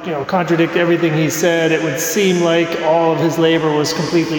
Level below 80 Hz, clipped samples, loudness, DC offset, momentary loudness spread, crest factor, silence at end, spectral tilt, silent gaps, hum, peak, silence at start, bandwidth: -56 dBFS; under 0.1%; -15 LUFS; under 0.1%; 3 LU; 12 dB; 0 s; -5 dB/octave; none; none; -4 dBFS; 0 s; 19.5 kHz